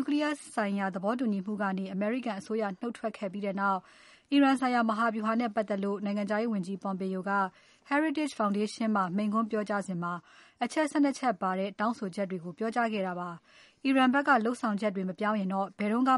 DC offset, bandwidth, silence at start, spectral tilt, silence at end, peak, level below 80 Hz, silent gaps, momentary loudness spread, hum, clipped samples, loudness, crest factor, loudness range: under 0.1%; 11.5 kHz; 0 s; -6 dB/octave; 0 s; -12 dBFS; -80 dBFS; none; 9 LU; none; under 0.1%; -30 LUFS; 18 dB; 3 LU